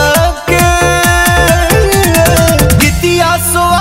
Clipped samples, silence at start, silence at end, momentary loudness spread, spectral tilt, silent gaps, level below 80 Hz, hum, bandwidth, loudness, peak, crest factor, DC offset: 0.2%; 0 s; 0 s; 2 LU; -4 dB/octave; none; -18 dBFS; none; 16.5 kHz; -8 LUFS; 0 dBFS; 8 dB; under 0.1%